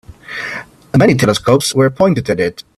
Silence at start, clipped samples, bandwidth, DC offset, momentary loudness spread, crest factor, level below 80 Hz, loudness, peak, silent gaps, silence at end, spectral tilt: 0.1 s; under 0.1%; 14 kHz; under 0.1%; 13 LU; 14 dB; -44 dBFS; -13 LUFS; 0 dBFS; none; 0.15 s; -5.5 dB/octave